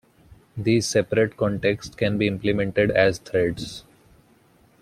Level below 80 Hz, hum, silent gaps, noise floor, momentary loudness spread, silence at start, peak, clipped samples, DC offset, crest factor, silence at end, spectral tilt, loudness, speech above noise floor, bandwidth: -50 dBFS; none; none; -57 dBFS; 11 LU; 0.3 s; -6 dBFS; under 0.1%; under 0.1%; 18 dB; 1 s; -5.5 dB/octave; -23 LUFS; 35 dB; 15 kHz